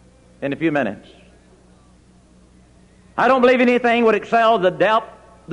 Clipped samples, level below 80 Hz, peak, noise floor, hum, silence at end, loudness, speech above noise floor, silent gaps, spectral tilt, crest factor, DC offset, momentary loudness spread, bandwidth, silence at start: under 0.1%; -54 dBFS; -4 dBFS; -50 dBFS; none; 0 s; -17 LUFS; 34 dB; none; -6 dB/octave; 16 dB; under 0.1%; 14 LU; 10.5 kHz; 0.4 s